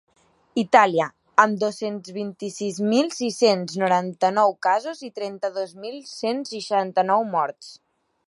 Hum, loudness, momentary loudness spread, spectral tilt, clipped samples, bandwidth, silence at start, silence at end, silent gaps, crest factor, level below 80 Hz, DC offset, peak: none; -22 LUFS; 13 LU; -4.5 dB/octave; under 0.1%; 11.5 kHz; 0.55 s; 0.5 s; none; 22 dB; -76 dBFS; under 0.1%; 0 dBFS